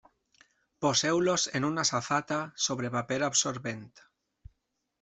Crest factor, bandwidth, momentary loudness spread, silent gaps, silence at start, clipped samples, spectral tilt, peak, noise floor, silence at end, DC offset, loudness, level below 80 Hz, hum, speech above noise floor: 18 dB; 8.2 kHz; 8 LU; none; 0.8 s; under 0.1%; -3 dB/octave; -12 dBFS; -80 dBFS; 1 s; under 0.1%; -29 LUFS; -66 dBFS; none; 50 dB